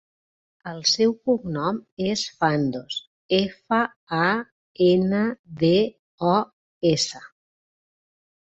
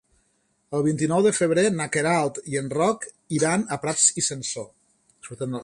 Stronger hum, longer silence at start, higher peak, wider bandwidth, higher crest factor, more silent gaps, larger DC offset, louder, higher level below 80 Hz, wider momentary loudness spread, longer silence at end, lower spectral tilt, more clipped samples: neither; about the same, 0.65 s vs 0.7 s; about the same, -6 dBFS vs -6 dBFS; second, 8.2 kHz vs 11.5 kHz; about the same, 18 dB vs 20 dB; first, 1.92-1.97 s, 3.07-3.29 s, 3.96-4.07 s, 4.52-4.75 s, 5.39-5.44 s, 5.99-6.18 s, 6.53-6.81 s vs none; neither; about the same, -23 LUFS vs -23 LUFS; about the same, -60 dBFS vs -62 dBFS; about the same, 12 LU vs 13 LU; first, 1.2 s vs 0 s; about the same, -5 dB/octave vs -4 dB/octave; neither